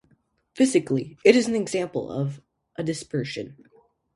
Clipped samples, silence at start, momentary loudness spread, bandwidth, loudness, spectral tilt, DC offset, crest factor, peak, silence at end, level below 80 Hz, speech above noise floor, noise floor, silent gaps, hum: under 0.1%; 0.55 s; 16 LU; 11.5 kHz; -24 LUFS; -5.5 dB/octave; under 0.1%; 22 dB; -2 dBFS; 0.65 s; -64 dBFS; 42 dB; -65 dBFS; none; none